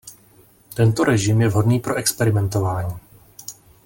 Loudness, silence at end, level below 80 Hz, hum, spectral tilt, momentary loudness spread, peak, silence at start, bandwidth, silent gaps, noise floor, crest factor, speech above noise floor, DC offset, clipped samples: -19 LUFS; 0.35 s; -48 dBFS; none; -5.5 dB/octave; 19 LU; -4 dBFS; 0.05 s; 17 kHz; none; -52 dBFS; 16 dB; 34 dB; under 0.1%; under 0.1%